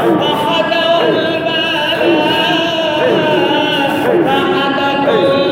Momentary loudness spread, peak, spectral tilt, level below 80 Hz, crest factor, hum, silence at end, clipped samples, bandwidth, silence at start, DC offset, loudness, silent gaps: 2 LU; -2 dBFS; -5 dB/octave; -52 dBFS; 12 dB; none; 0 s; under 0.1%; 17 kHz; 0 s; under 0.1%; -12 LUFS; none